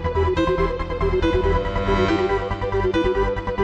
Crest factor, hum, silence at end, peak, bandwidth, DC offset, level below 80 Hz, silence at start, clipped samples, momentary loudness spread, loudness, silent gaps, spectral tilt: 12 dB; none; 0 s; -8 dBFS; 8.4 kHz; under 0.1%; -28 dBFS; 0 s; under 0.1%; 4 LU; -21 LUFS; none; -7.5 dB/octave